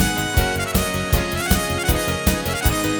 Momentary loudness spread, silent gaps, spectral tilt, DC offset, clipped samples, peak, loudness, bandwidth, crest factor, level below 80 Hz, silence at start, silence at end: 1 LU; none; -4 dB/octave; under 0.1%; under 0.1%; -2 dBFS; -20 LUFS; over 20 kHz; 18 dB; -26 dBFS; 0 s; 0 s